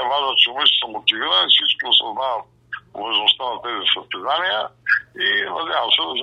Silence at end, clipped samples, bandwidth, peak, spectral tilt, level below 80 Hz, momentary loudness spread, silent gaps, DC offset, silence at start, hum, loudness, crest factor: 0 s; under 0.1%; 9.8 kHz; 0 dBFS; -2.5 dB/octave; -66 dBFS; 11 LU; none; under 0.1%; 0 s; none; -17 LUFS; 20 dB